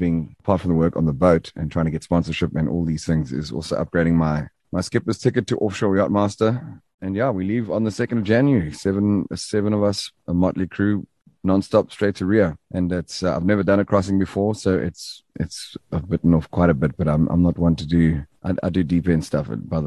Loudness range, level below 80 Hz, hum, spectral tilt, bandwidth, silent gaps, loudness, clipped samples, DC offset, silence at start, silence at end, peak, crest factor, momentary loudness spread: 2 LU; -38 dBFS; none; -7 dB/octave; 12 kHz; 6.94-6.98 s; -21 LUFS; under 0.1%; under 0.1%; 0 s; 0 s; -2 dBFS; 18 dB; 9 LU